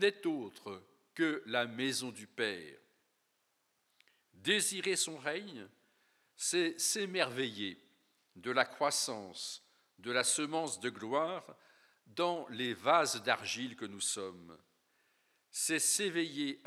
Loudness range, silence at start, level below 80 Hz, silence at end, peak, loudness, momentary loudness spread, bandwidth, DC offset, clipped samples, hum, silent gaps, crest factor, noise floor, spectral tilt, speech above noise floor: 3 LU; 0 s; under -90 dBFS; 0.1 s; -12 dBFS; -35 LUFS; 16 LU; 16.5 kHz; under 0.1%; under 0.1%; none; none; 24 dB; -79 dBFS; -2 dB/octave; 43 dB